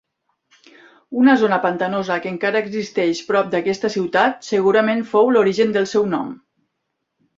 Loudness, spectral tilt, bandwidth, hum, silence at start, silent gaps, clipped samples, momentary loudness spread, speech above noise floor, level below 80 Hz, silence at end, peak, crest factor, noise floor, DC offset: -18 LUFS; -5.5 dB/octave; 7.8 kHz; none; 1.1 s; none; under 0.1%; 7 LU; 58 dB; -64 dBFS; 1.05 s; -2 dBFS; 18 dB; -75 dBFS; under 0.1%